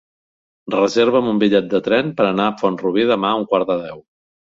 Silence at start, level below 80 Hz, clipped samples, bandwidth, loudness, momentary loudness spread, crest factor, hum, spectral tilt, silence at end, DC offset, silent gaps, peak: 0.65 s; -58 dBFS; under 0.1%; 7.6 kHz; -17 LUFS; 6 LU; 16 dB; none; -6 dB/octave; 0.55 s; under 0.1%; none; -2 dBFS